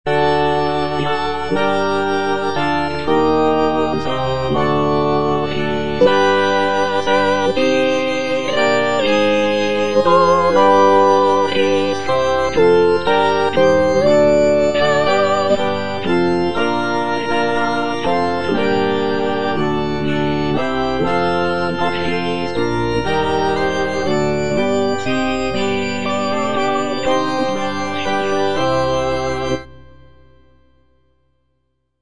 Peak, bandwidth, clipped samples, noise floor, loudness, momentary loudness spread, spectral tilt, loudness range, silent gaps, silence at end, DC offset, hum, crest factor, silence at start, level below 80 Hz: -2 dBFS; 10 kHz; under 0.1%; -69 dBFS; -16 LUFS; 7 LU; -5.5 dB/octave; 5 LU; none; 0 s; 4%; none; 16 dB; 0.05 s; -42 dBFS